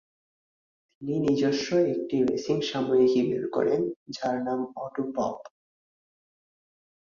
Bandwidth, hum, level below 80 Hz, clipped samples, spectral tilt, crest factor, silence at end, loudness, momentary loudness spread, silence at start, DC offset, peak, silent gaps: 7.4 kHz; none; -66 dBFS; under 0.1%; -6 dB/octave; 16 dB; 1.55 s; -27 LUFS; 10 LU; 1 s; under 0.1%; -12 dBFS; 3.96-4.06 s